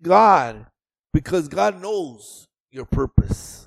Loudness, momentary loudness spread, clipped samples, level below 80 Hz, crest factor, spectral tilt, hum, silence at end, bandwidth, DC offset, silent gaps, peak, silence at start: -20 LUFS; 21 LU; under 0.1%; -34 dBFS; 20 dB; -6.5 dB/octave; none; 0.1 s; 14.5 kHz; under 0.1%; 2.60-2.66 s; 0 dBFS; 0.05 s